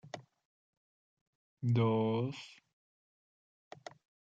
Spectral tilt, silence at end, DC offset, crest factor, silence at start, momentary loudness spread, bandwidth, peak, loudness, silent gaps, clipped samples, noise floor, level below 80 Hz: -8 dB/octave; 1.7 s; under 0.1%; 20 dB; 0.05 s; 22 LU; 7.6 kHz; -20 dBFS; -33 LUFS; 0.45-1.57 s; under 0.1%; under -90 dBFS; -82 dBFS